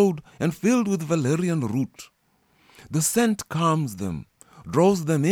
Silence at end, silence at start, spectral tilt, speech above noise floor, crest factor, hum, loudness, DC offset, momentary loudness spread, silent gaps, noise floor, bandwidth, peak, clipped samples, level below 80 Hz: 0 s; 0 s; -5.5 dB/octave; 42 dB; 16 dB; none; -24 LUFS; under 0.1%; 9 LU; none; -65 dBFS; 19 kHz; -8 dBFS; under 0.1%; -58 dBFS